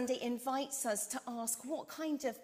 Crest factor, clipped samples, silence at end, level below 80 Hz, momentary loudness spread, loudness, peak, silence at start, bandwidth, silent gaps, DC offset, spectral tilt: 16 dB; under 0.1%; 0 s; -82 dBFS; 4 LU; -38 LUFS; -22 dBFS; 0 s; 16 kHz; none; under 0.1%; -2 dB/octave